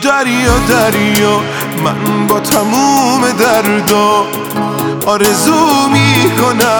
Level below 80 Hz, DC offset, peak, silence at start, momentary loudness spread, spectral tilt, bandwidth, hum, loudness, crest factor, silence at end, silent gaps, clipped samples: -30 dBFS; under 0.1%; 0 dBFS; 0 s; 6 LU; -4 dB/octave; over 20 kHz; none; -10 LUFS; 10 dB; 0 s; none; under 0.1%